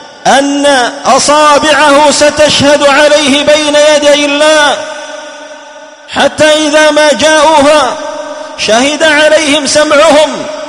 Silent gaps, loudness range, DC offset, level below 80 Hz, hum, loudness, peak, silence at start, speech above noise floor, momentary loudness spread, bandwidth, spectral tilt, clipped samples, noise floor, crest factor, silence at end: none; 3 LU; under 0.1%; -42 dBFS; none; -6 LUFS; 0 dBFS; 0 s; 24 dB; 13 LU; 12 kHz; -2 dB/octave; 2%; -30 dBFS; 6 dB; 0 s